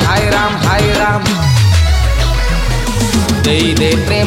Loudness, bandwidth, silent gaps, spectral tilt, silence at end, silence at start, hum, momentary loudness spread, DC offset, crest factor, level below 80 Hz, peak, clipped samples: -12 LUFS; 16.5 kHz; none; -5 dB/octave; 0 s; 0 s; none; 4 LU; under 0.1%; 10 dB; -18 dBFS; -2 dBFS; under 0.1%